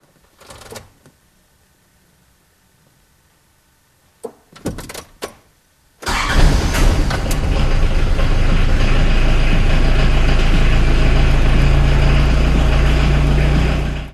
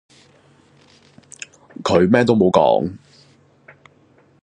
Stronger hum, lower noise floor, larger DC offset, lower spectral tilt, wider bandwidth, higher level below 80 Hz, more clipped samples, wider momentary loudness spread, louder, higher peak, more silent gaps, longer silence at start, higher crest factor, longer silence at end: neither; about the same, -56 dBFS vs -54 dBFS; neither; about the same, -5.5 dB/octave vs -6.5 dB/octave; first, 12.5 kHz vs 9.8 kHz; first, -16 dBFS vs -50 dBFS; neither; second, 17 LU vs 22 LU; about the same, -17 LUFS vs -16 LUFS; about the same, 0 dBFS vs 0 dBFS; neither; second, 0.7 s vs 1.8 s; second, 14 dB vs 20 dB; second, 0.05 s vs 1.45 s